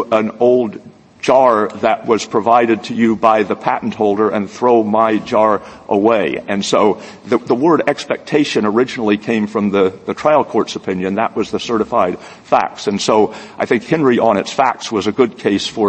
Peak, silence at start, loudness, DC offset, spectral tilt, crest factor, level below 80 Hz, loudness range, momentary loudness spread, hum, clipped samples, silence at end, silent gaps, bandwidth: 0 dBFS; 0 s; -15 LUFS; under 0.1%; -5.5 dB/octave; 14 dB; -56 dBFS; 2 LU; 7 LU; none; under 0.1%; 0 s; none; 8.8 kHz